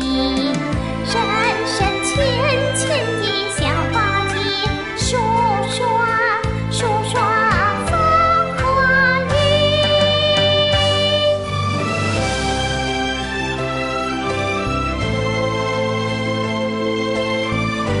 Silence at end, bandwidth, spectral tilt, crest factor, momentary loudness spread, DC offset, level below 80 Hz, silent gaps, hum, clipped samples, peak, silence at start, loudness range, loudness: 0 s; 11.5 kHz; -4.5 dB/octave; 14 dB; 6 LU; 0.2%; -34 dBFS; none; none; under 0.1%; -4 dBFS; 0 s; 5 LU; -17 LUFS